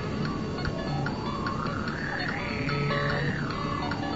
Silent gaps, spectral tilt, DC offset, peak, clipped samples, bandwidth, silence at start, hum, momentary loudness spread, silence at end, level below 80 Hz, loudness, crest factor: none; -6.5 dB/octave; 0.3%; -14 dBFS; under 0.1%; 8 kHz; 0 s; none; 4 LU; 0 s; -44 dBFS; -30 LUFS; 16 dB